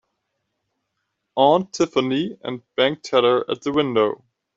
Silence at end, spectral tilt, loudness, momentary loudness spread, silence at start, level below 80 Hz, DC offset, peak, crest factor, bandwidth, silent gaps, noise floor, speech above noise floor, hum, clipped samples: 0.4 s; -5 dB/octave; -20 LUFS; 11 LU; 1.35 s; -64 dBFS; under 0.1%; -4 dBFS; 18 dB; 7.8 kHz; none; -76 dBFS; 57 dB; none; under 0.1%